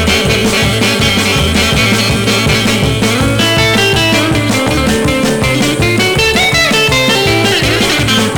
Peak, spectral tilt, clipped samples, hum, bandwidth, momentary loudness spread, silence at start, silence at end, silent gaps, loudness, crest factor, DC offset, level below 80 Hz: -2 dBFS; -4 dB/octave; under 0.1%; none; 19.5 kHz; 3 LU; 0 s; 0 s; none; -10 LUFS; 10 dB; 0.2%; -26 dBFS